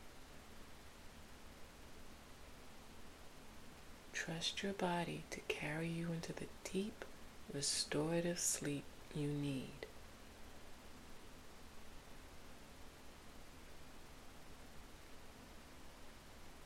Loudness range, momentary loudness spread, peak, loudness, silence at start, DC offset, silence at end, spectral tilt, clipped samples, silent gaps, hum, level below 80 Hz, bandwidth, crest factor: 17 LU; 20 LU; -24 dBFS; -43 LUFS; 0 s; under 0.1%; 0 s; -3.5 dB/octave; under 0.1%; none; none; -62 dBFS; 16.5 kHz; 22 dB